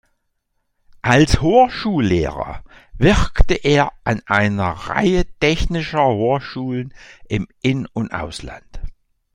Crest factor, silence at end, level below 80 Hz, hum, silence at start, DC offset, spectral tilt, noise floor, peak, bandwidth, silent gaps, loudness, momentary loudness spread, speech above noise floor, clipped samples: 18 dB; 0.45 s; -28 dBFS; none; 1.05 s; under 0.1%; -6 dB/octave; -70 dBFS; 0 dBFS; 11 kHz; none; -18 LUFS; 16 LU; 53 dB; under 0.1%